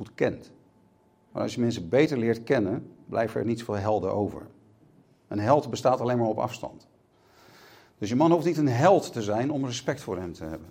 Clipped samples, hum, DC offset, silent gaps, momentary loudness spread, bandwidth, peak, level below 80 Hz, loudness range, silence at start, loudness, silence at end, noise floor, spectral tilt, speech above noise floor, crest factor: under 0.1%; none; under 0.1%; none; 14 LU; 16 kHz; -6 dBFS; -62 dBFS; 3 LU; 0 s; -26 LUFS; 0 s; -62 dBFS; -6.5 dB/octave; 36 dB; 20 dB